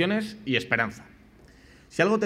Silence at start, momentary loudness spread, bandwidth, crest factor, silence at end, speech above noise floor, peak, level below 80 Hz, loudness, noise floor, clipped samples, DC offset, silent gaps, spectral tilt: 0 s; 11 LU; 14 kHz; 22 dB; 0 s; 28 dB; -6 dBFS; -60 dBFS; -27 LUFS; -53 dBFS; under 0.1%; under 0.1%; none; -5.5 dB/octave